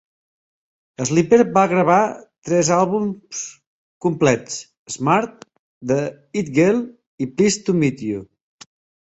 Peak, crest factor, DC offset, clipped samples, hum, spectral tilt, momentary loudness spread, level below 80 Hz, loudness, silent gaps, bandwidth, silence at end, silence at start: -2 dBFS; 18 dB; under 0.1%; under 0.1%; none; -5.5 dB/octave; 16 LU; -58 dBFS; -19 LUFS; 2.38-2.42 s, 3.67-4.00 s, 4.77-4.86 s, 5.59-5.81 s, 7.07-7.18 s; 8.2 kHz; 0.8 s; 1 s